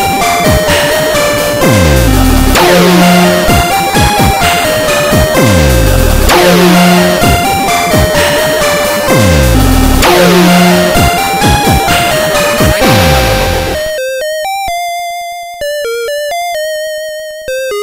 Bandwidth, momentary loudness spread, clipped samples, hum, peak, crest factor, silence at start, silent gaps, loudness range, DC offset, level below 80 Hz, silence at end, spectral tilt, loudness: 16.5 kHz; 10 LU; 1%; none; 0 dBFS; 8 dB; 0 s; none; 7 LU; under 0.1%; -18 dBFS; 0 s; -4.5 dB/octave; -8 LUFS